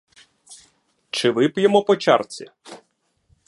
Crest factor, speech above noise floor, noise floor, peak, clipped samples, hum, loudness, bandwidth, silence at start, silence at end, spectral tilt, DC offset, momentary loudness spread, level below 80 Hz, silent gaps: 20 dB; 49 dB; -67 dBFS; -2 dBFS; under 0.1%; none; -19 LUFS; 11.5 kHz; 0.5 s; 0.7 s; -5 dB/octave; under 0.1%; 18 LU; -70 dBFS; none